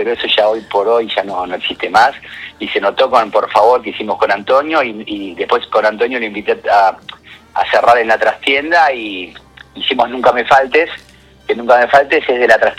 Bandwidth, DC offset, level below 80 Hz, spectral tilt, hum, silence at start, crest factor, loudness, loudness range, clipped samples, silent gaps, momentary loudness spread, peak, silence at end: 13 kHz; under 0.1%; -50 dBFS; -3.5 dB/octave; none; 0 s; 14 dB; -13 LUFS; 2 LU; 0.2%; none; 13 LU; 0 dBFS; 0 s